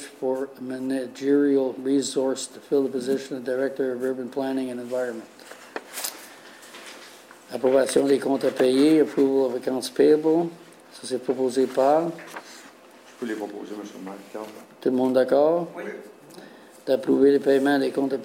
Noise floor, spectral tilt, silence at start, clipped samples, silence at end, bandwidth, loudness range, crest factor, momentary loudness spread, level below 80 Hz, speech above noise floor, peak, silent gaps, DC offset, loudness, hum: -49 dBFS; -5 dB/octave; 0 s; under 0.1%; 0 s; 16 kHz; 8 LU; 18 dB; 20 LU; -72 dBFS; 26 dB; -6 dBFS; none; under 0.1%; -23 LUFS; none